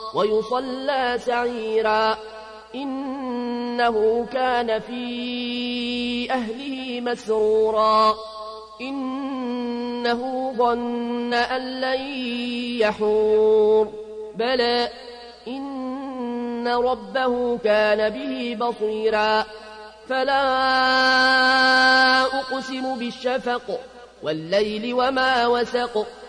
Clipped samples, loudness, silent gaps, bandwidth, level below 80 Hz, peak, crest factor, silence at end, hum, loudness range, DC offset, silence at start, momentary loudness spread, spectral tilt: under 0.1%; -22 LUFS; none; 10.5 kHz; -56 dBFS; -8 dBFS; 14 dB; 0 s; none; 7 LU; under 0.1%; 0 s; 13 LU; -4 dB/octave